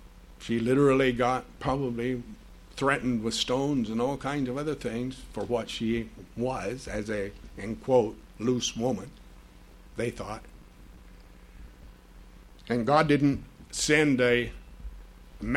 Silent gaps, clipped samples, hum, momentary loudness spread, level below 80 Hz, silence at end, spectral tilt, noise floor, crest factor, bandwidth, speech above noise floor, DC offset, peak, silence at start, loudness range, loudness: none; under 0.1%; none; 17 LU; -48 dBFS; 0 s; -5 dB/octave; -51 dBFS; 22 dB; 14 kHz; 23 dB; under 0.1%; -8 dBFS; 0 s; 10 LU; -28 LUFS